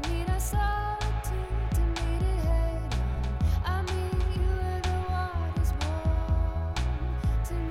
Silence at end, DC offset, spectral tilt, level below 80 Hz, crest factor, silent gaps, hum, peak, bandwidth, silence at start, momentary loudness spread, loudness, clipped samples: 0 s; under 0.1%; -6 dB/octave; -30 dBFS; 12 dB; none; none; -16 dBFS; 15 kHz; 0 s; 3 LU; -30 LUFS; under 0.1%